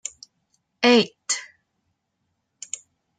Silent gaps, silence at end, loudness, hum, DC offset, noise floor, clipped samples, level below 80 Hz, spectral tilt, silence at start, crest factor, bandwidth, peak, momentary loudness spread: none; 1.75 s; -20 LUFS; none; under 0.1%; -76 dBFS; under 0.1%; -74 dBFS; -2.5 dB/octave; 0.8 s; 24 dB; 9.6 kHz; -2 dBFS; 19 LU